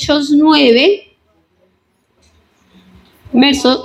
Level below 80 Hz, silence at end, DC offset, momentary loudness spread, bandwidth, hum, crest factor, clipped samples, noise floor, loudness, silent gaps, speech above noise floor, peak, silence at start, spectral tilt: -48 dBFS; 0 s; under 0.1%; 8 LU; 13 kHz; none; 14 dB; under 0.1%; -60 dBFS; -10 LUFS; none; 50 dB; 0 dBFS; 0 s; -3.5 dB/octave